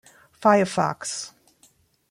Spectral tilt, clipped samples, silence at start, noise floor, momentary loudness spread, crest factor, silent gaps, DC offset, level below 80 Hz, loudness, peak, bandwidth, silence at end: -4.5 dB/octave; under 0.1%; 0.4 s; -60 dBFS; 14 LU; 20 dB; none; under 0.1%; -66 dBFS; -23 LUFS; -4 dBFS; 15.5 kHz; 0.8 s